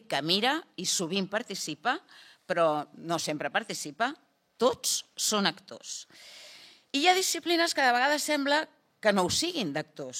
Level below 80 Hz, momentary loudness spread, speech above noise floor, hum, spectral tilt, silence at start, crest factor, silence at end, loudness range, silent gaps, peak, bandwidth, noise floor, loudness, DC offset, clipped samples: -70 dBFS; 15 LU; 24 dB; none; -2.5 dB/octave; 0.1 s; 22 dB; 0 s; 5 LU; none; -8 dBFS; 16.5 kHz; -53 dBFS; -28 LUFS; under 0.1%; under 0.1%